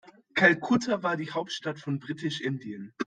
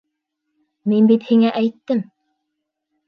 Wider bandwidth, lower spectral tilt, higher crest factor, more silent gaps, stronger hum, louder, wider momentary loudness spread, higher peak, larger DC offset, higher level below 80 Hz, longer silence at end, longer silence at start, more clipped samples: first, 9.4 kHz vs 5.2 kHz; second, -5 dB/octave vs -9 dB/octave; first, 24 dB vs 16 dB; neither; neither; second, -28 LUFS vs -17 LUFS; about the same, 12 LU vs 11 LU; about the same, -6 dBFS vs -4 dBFS; neither; about the same, -70 dBFS vs -74 dBFS; second, 0 s vs 1.05 s; second, 0.05 s vs 0.85 s; neither